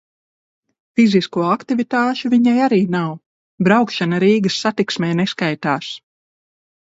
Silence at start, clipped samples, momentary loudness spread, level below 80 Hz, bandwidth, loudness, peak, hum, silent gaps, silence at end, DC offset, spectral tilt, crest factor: 0.95 s; under 0.1%; 9 LU; -62 dBFS; 8 kHz; -17 LUFS; 0 dBFS; none; 3.26-3.58 s; 0.85 s; under 0.1%; -6 dB/octave; 18 dB